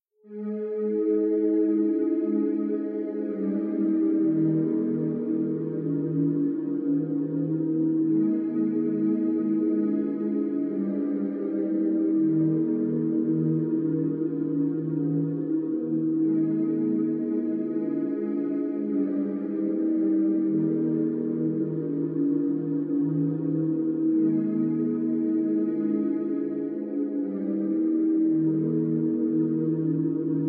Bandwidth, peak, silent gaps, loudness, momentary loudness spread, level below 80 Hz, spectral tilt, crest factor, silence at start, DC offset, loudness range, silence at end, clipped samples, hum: 2.5 kHz; -14 dBFS; none; -26 LUFS; 5 LU; -80 dBFS; -12.5 dB/octave; 10 dB; 0.25 s; under 0.1%; 1 LU; 0 s; under 0.1%; none